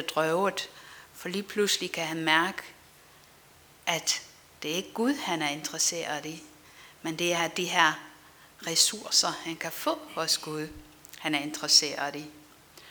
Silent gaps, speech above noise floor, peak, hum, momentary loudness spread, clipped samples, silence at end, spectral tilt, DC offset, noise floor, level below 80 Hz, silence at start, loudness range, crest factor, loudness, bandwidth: none; 27 dB; -6 dBFS; none; 17 LU; under 0.1%; 0 s; -1.5 dB/octave; under 0.1%; -56 dBFS; -68 dBFS; 0 s; 4 LU; 24 dB; -27 LUFS; over 20 kHz